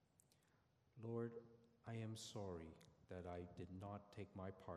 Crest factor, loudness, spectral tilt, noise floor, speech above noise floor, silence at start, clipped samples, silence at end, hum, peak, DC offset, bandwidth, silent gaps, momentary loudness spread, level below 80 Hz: 18 dB; -54 LUFS; -6 dB/octave; -80 dBFS; 26 dB; 0.2 s; under 0.1%; 0 s; none; -36 dBFS; under 0.1%; 13 kHz; none; 12 LU; -80 dBFS